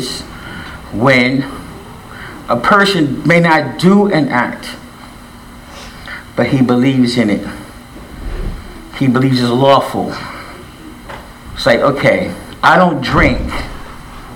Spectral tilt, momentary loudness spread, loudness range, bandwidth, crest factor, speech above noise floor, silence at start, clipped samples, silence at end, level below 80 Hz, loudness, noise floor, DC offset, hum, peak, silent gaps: -6 dB/octave; 22 LU; 4 LU; 17.5 kHz; 14 dB; 23 dB; 0 s; under 0.1%; 0 s; -32 dBFS; -12 LUFS; -34 dBFS; under 0.1%; none; 0 dBFS; none